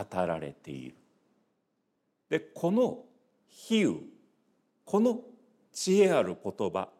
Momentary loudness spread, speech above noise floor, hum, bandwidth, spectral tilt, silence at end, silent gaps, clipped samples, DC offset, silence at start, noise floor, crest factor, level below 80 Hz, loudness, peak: 19 LU; 49 dB; none; 14.5 kHz; -5.5 dB/octave; 0.15 s; none; under 0.1%; under 0.1%; 0 s; -78 dBFS; 18 dB; -74 dBFS; -29 LUFS; -12 dBFS